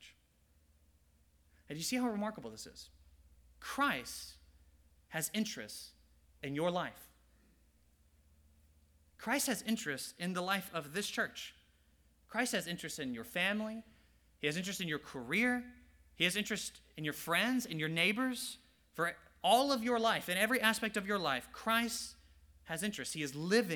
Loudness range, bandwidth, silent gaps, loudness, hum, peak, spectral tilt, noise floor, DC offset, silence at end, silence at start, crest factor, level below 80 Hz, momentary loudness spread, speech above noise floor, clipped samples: 9 LU; over 20 kHz; none; -36 LUFS; none; -12 dBFS; -3 dB/octave; -71 dBFS; under 0.1%; 0 s; 0 s; 26 dB; -68 dBFS; 16 LU; 34 dB; under 0.1%